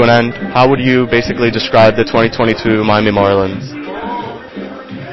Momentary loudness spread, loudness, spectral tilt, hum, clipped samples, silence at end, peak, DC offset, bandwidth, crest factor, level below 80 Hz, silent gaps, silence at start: 17 LU; -12 LUFS; -7 dB/octave; none; 0.2%; 0 s; 0 dBFS; under 0.1%; 8 kHz; 12 dB; -38 dBFS; none; 0 s